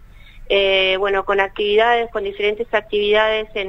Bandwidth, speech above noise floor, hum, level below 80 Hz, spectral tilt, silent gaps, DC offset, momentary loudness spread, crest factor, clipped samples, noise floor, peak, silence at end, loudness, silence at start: 7.4 kHz; 21 dB; none; -42 dBFS; -4.5 dB/octave; none; under 0.1%; 6 LU; 18 dB; under 0.1%; -39 dBFS; 0 dBFS; 0 s; -17 LUFS; 0.35 s